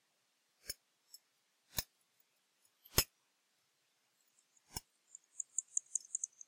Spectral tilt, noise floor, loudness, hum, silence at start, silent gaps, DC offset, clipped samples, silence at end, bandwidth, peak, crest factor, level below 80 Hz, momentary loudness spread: -1 dB/octave; -80 dBFS; -41 LUFS; none; 0.65 s; none; under 0.1%; under 0.1%; 0.2 s; 16 kHz; -12 dBFS; 34 dB; -60 dBFS; 25 LU